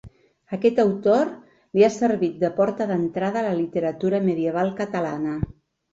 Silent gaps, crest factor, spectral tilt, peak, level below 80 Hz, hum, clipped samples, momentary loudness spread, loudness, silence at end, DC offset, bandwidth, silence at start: none; 18 dB; -7 dB/octave; -6 dBFS; -50 dBFS; none; under 0.1%; 8 LU; -23 LUFS; 0.4 s; under 0.1%; 8 kHz; 0.05 s